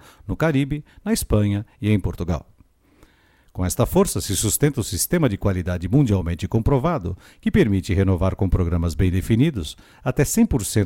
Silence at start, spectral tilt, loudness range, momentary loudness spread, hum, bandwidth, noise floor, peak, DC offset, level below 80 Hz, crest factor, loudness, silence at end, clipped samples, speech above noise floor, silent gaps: 0.25 s; -6 dB/octave; 3 LU; 9 LU; none; 17 kHz; -56 dBFS; -4 dBFS; under 0.1%; -34 dBFS; 16 dB; -21 LUFS; 0 s; under 0.1%; 36 dB; none